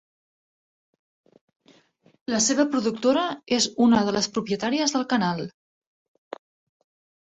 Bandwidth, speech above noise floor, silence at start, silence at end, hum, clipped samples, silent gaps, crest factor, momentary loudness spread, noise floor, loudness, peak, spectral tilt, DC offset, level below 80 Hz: 8.4 kHz; 37 dB; 2.3 s; 1.7 s; none; under 0.1%; none; 20 dB; 20 LU; -60 dBFS; -23 LUFS; -6 dBFS; -3.5 dB/octave; under 0.1%; -64 dBFS